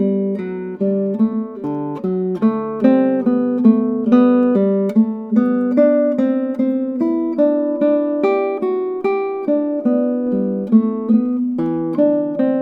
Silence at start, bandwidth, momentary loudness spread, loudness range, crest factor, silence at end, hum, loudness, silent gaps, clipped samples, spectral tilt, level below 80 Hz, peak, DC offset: 0 s; 4.2 kHz; 6 LU; 3 LU; 16 dB; 0 s; none; -17 LUFS; none; under 0.1%; -10.5 dB/octave; -68 dBFS; 0 dBFS; under 0.1%